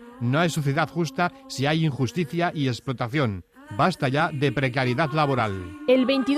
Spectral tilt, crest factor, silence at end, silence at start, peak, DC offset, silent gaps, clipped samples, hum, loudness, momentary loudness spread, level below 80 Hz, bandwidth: -6 dB/octave; 16 dB; 0 s; 0 s; -8 dBFS; under 0.1%; none; under 0.1%; none; -24 LUFS; 5 LU; -56 dBFS; 14.5 kHz